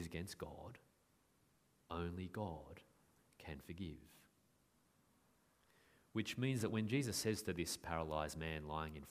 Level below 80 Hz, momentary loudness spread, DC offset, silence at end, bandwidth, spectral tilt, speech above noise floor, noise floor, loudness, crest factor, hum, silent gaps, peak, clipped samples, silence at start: -64 dBFS; 17 LU; under 0.1%; 0 s; 15.5 kHz; -5 dB/octave; 33 dB; -77 dBFS; -44 LUFS; 22 dB; none; none; -24 dBFS; under 0.1%; 0 s